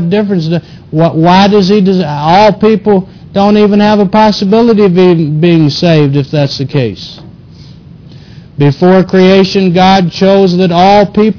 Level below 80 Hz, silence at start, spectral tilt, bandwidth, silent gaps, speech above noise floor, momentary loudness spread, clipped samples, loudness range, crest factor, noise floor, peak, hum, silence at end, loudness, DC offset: -40 dBFS; 0 s; -7.5 dB/octave; 5.4 kHz; none; 25 dB; 7 LU; 0.8%; 5 LU; 8 dB; -32 dBFS; 0 dBFS; none; 0 s; -7 LUFS; under 0.1%